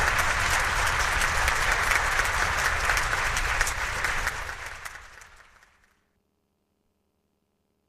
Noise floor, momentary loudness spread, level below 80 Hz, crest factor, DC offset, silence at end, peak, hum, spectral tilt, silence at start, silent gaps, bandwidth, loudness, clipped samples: -74 dBFS; 13 LU; -36 dBFS; 20 dB; under 0.1%; 2.65 s; -8 dBFS; none; -1.5 dB/octave; 0 s; none; 15.5 kHz; -24 LUFS; under 0.1%